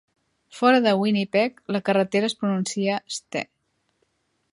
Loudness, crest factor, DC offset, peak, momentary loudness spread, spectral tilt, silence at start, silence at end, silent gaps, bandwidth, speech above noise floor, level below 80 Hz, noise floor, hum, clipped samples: -23 LUFS; 18 dB; under 0.1%; -6 dBFS; 11 LU; -5 dB/octave; 0.55 s; 1.1 s; none; 11.5 kHz; 48 dB; -72 dBFS; -71 dBFS; none; under 0.1%